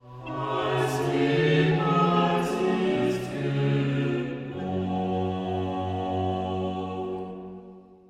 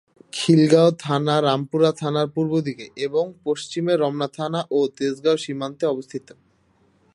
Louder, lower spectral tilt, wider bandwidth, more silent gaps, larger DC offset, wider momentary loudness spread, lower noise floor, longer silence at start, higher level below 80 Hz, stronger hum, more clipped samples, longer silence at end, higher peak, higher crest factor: second, -26 LUFS vs -21 LUFS; about the same, -7 dB/octave vs -6 dB/octave; first, 14.5 kHz vs 11.5 kHz; neither; neither; about the same, 11 LU vs 12 LU; second, -48 dBFS vs -61 dBFS; second, 0.05 s vs 0.35 s; first, -58 dBFS vs -68 dBFS; neither; neither; second, 0.15 s vs 0.95 s; second, -10 dBFS vs -4 dBFS; about the same, 16 dB vs 18 dB